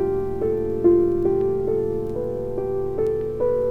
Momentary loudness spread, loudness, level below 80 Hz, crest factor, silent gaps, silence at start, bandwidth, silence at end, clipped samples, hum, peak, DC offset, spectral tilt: 8 LU; -22 LUFS; -40 dBFS; 16 dB; none; 0 s; 3.5 kHz; 0 s; under 0.1%; none; -6 dBFS; under 0.1%; -10.5 dB/octave